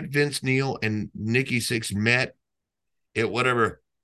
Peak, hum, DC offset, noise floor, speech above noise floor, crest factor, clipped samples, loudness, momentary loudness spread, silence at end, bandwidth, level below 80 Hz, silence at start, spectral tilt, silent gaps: -4 dBFS; none; under 0.1%; -83 dBFS; 59 dB; 20 dB; under 0.1%; -24 LUFS; 6 LU; 0.3 s; 12.5 kHz; -54 dBFS; 0 s; -5 dB/octave; none